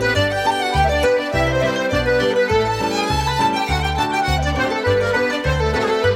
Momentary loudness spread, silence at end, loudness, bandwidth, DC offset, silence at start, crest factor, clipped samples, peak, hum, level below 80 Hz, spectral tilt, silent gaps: 2 LU; 0 s; -18 LUFS; 16 kHz; under 0.1%; 0 s; 14 dB; under 0.1%; -4 dBFS; none; -30 dBFS; -5 dB/octave; none